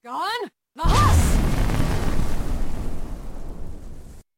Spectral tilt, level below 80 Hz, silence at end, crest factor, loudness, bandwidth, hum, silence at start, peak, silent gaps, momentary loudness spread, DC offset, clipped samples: -5.5 dB/octave; -24 dBFS; 0.2 s; 14 dB; -23 LUFS; 16.5 kHz; none; 0.05 s; -6 dBFS; none; 21 LU; under 0.1%; under 0.1%